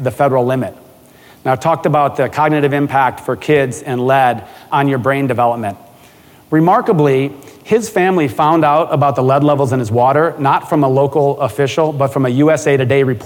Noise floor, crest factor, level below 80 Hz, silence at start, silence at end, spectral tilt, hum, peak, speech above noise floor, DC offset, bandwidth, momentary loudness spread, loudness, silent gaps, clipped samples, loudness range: -43 dBFS; 12 dB; -54 dBFS; 0 s; 0 s; -7 dB/octave; none; -2 dBFS; 30 dB; under 0.1%; 17.5 kHz; 6 LU; -14 LUFS; none; under 0.1%; 3 LU